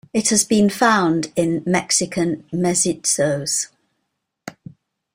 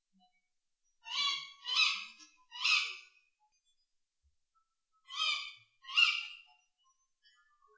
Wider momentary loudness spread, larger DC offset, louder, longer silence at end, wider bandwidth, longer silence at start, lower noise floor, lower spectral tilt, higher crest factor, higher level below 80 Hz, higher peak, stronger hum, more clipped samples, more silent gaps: second, 15 LU vs 22 LU; neither; first, -18 LUFS vs -31 LUFS; second, 0.65 s vs 1.35 s; first, 16 kHz vs 8 kHz; second, 0.15 s vs 1.05 s; second, -75 dBFS vs -81 dBFS; first, -3.5 dB/octave vs 4.5 dB/octave; second, 18 dB vs 24 dB; first, -56 dBFS vs under -90 dBFS; first, -2 dBFS vs -14 dBFS; neither; neither; neither